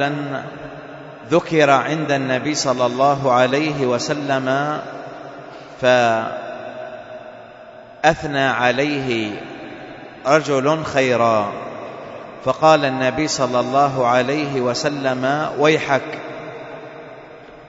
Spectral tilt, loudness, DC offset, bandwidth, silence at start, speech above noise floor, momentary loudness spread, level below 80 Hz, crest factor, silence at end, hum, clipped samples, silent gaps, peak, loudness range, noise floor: -4.5 dB/octave; -18 LUFS; under 0.1%; 8 kHz; 0 s; 22 dB; 20 LU; -54 dBFS; 20 dB; 0 s; none; under 0.1%; none; 0 dBFS; 4 LU; -40 dBFS